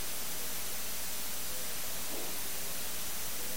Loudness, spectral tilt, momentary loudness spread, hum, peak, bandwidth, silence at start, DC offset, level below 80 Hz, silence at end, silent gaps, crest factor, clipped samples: -36 LUFS; -1 dB/octave; 0 LU; none; -24 dBFS; 17 kHz; 0 s; 2%; -56 dBFS; 0 s; none; 12 dB; under 0.1%